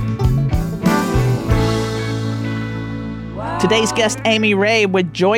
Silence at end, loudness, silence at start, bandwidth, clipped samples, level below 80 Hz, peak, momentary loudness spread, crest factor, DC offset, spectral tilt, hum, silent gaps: 0 s; -17 LUFS; 0 s; 16.5 kHz; under 0.1%; -28 dBFS; -2 dBFS; 11 LU; 14 dB; under 0.1%; -5.5 dB/octave; none; none